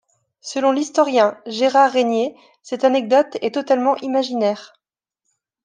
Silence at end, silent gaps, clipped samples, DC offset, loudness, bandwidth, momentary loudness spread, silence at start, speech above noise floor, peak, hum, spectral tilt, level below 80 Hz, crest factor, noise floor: 1 s; none; under 0.1%; under 0.1%; -18 LUFS; 9.6 kHz; 11 LU; 0.45 s; 63 dB; -2 dBFS; none; -4 dB/octave; -76 dBFS; 16 dB; -80 dBFS